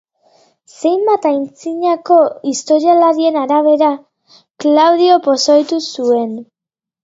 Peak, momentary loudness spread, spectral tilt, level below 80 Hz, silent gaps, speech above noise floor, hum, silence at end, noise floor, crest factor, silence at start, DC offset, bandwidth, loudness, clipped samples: 0 dBFS; 9 LU; -3.5 dB/octave; -70 dBFS; none; 74 dB; none; 0.6 s; -86 dBFS; 14 dB; 0.8 s; under 0.1%; 7.8 kHz; -13 LUFS; under 0.1%